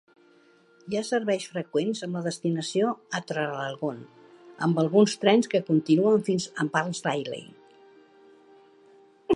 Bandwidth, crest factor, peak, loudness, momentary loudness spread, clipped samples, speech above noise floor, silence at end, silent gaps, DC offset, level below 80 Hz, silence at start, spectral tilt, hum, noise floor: 11.5 kHz; 22 dB; -6 dBFS; -26 LUFS; 11 LU; under 0.1%; 33 dB; 0 s; none; under 0.1%; -74 dBFS; 0.85 s; -5.5 dB/octave; none; -59 dBFS